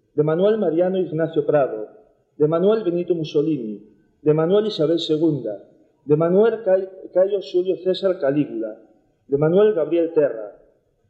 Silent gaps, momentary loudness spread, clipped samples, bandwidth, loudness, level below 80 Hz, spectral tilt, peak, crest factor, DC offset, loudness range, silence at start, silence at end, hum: none; 13 LU; under 0.1%; 7.8 kHz; -20 LUFS; -66 dBFS; -8.5 dB/octave; -4 dBFS; 16 dB; under 0.1%; 2 LU; 0.15 s; 0.6 s; none